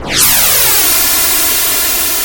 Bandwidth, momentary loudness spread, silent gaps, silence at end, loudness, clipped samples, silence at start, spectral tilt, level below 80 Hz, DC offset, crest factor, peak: over 20 kHz; 3 LU; none; 0 s; -7 LUFS; 0.1%; 0 s; 0 dB/octave; -34 dBFS; under 0.1%; 10 dB; 0 dBFS